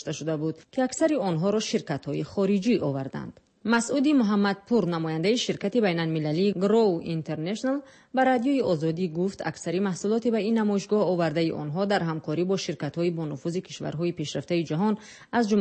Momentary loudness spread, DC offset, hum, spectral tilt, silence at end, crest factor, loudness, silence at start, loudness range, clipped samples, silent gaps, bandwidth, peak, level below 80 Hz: 9 LU; under 0.1%; none; -6 dB/octave; 0 s; 16 dB; -26 LUFS; 0 s; 4 LU; under 0.1%; none; 8.8 kHz; -10 dBFS; -66 dBFS